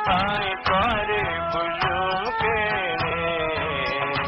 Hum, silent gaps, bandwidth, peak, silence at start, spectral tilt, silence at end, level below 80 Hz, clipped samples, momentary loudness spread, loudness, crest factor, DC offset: none; none; 7.8 kHz; -8 dBFS; 0 s; -6.5 dB/octave; 0 s; -42 dBFS; under 0.1%; 3 LU; -23 LUFS; 16 dB; under 0.1%